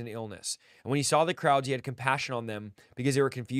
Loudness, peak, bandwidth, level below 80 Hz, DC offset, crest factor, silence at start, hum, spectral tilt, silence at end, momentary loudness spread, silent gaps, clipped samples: -29 LUFS; -8 dBFS; 15.5 kHz; -70 dBFS; under 0.1%; 22 dB; 0 s; none; -4.5 dB/octave; 0 s; 13 LU; none; under 0.1%